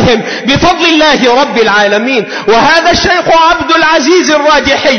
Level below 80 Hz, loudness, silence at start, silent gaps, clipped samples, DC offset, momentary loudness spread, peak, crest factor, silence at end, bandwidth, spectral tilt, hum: -32 dBFS; -7 LUFS; 0 s; none; 0.2%; 1%; 4 LU; 0 dBFS; 8 dB; 0 s; 11 kHz; -3.5 dB/octave; none